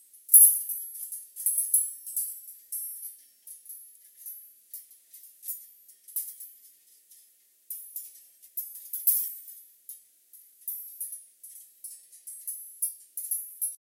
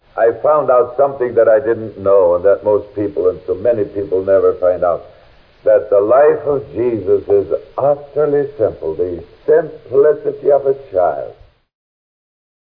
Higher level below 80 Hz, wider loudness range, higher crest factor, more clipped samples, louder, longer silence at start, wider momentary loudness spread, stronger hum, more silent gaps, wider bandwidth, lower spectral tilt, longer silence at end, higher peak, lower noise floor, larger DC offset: second, under -90 dBFS vs -50 dBFS; first, 11 LU vs 3 LU; first, 32 dB vs 12 dB; neither; second, -25 LUFS vs -15 LUFS; first, 0.3 s vs 0.15 s; first, 22 LU vs 8 LU; neither; neither; first, 17 kHz vs 4.9 kHz; second, 6.5 dB/octave vs -11 dB/octave; second, 0.25 s vs 1.45 s; about the same, 0 dBFS vs -2 dBFS; first, -62 dBFS vs -46 dBFS; neither